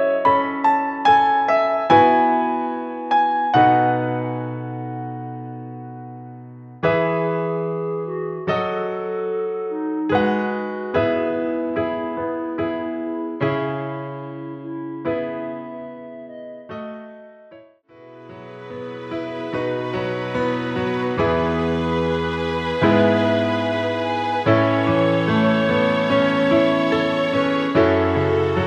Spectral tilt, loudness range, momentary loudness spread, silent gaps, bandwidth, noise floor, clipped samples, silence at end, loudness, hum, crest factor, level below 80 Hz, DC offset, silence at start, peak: -7.5 dB/octave; 13 LU; 17 LU; none; 8.8 kHz; -47 dBFS; under 0.1%; 0 s; -20 LUFS; none; 18 dB; -50 dBFS; under 0.1%; 0 s; -2 dBFS